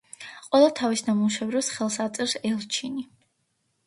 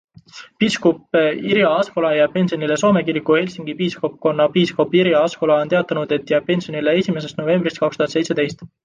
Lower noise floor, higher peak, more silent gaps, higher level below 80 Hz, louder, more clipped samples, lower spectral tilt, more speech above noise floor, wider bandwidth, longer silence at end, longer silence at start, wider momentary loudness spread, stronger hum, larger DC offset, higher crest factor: first, -73 dBFS vs -42 dBFS; second, -6 dBFS vs -2 dBFS; neither; second, -72 dBFS vs -60 dBFS; second, -25 LUFS vs -18 LUFS; neither; second, -3.5 dB/octave vs -6 dB/octave; first, 49 dB vs 24 dB; first, 11.5 kHz vs 9.8 kHz; first, 0.8 s vs 0.15 s; second, 0.2 s vs 0.35 s; first, 16 LU vs 5 LU; neither; neither; about the same, 20 dB vs 16 dB